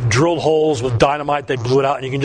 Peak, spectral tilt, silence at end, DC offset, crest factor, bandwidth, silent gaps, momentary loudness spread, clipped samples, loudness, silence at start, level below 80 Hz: 0 dBFS; -5.5 dB/octave; 0 s; under 0.1%; 16 dB; 10.5 kHz; none; 5 LU; under 0.1%; -17 LUFS; 0 s; -42 dBFS